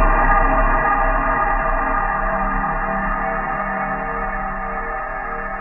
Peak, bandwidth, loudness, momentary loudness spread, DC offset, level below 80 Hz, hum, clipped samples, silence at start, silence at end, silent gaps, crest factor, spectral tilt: -4 dBFS; 3 kHz; -20 LUFS; 9 LU; under 0.1%; -24 dBFS; none; under 0.1%; 0 s; 0 s; none; 16 dB; -10.5 dB/octave